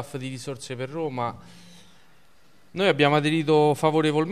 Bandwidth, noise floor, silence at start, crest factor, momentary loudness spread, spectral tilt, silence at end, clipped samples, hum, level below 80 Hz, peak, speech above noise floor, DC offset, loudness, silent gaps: 14 kHz; -60 dBFS; 0 s; 18 dB; 14 LU; -6 dB/octave; 0 s; under 0.1%; none; -64 dBFS; -6 dBFS; 36 dB; 0.3%; -23 LUFS; none